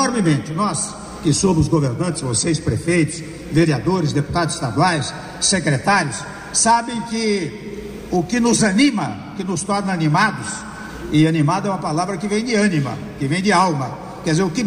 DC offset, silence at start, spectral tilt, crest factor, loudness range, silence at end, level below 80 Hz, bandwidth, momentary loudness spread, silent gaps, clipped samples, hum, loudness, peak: under 0.1%; 0 s; -4.5 dB/octave; 14 dB; 1 LU; 0 s; -42 dBFS; 15 kHz; 11 LU; none; under 0.1%; none; -19 LUFS; -4 dBFS